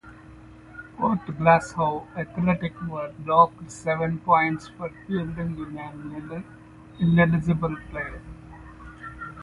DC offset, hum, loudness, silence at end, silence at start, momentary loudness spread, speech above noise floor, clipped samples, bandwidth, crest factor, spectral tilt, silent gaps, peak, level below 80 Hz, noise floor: under 0.1%; none; -24 LUFS; 0 s; 0.05 s; 23 LU; 22 dB; under 0.1%; 11 kHz; 22 dB; -7.5 dB/octave; none; -4 dBFS; -48 dBFS; -46 dBFS